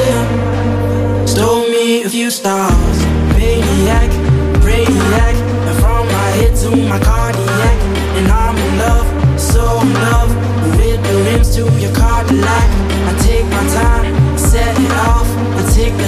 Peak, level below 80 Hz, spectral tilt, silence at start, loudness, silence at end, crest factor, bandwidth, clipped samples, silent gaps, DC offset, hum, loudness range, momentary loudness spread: 0 dBFS; -14 dBFS; -5.5 dB/octave; 0 s; -13 LUFS; 0 s; 10 dB; 15.5 kHz; under 0.1%; none; under 0.1%; none; 1 LU; 3 LU